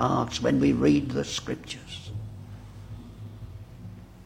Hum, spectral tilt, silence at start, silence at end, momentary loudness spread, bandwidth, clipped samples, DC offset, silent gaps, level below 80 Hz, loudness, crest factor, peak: none; -6 dB/octave; 0 s; 0 s; 21 LU; 11.5 kHz; under 0.1%; under 0.1%; none; -48 dBFS; -26 LUFS; 20 dB; -8 dBFS